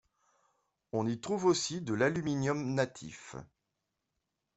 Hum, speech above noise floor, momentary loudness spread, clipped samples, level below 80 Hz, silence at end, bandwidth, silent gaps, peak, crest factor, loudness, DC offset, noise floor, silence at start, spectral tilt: none; 53 dB; 17 LU; under 0.1%; -68 dBFS; 1.1 s; 8.2 kHz; none; -16 dBFS; 18 dB; -33 LUFS; under 0.1%; -85 dBFS; 0.95 s; -5 dB/octave